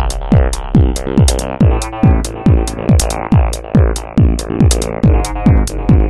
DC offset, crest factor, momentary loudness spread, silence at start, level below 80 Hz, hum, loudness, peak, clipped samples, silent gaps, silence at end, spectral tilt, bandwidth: under 0.1%; 12 dB; 1 LU; 0 s; -16 dBFS; none; -13 LUFS; 0 dBFS; under 0.1%; none; 0 s; -6.5 dB/octave; 12.5 kHz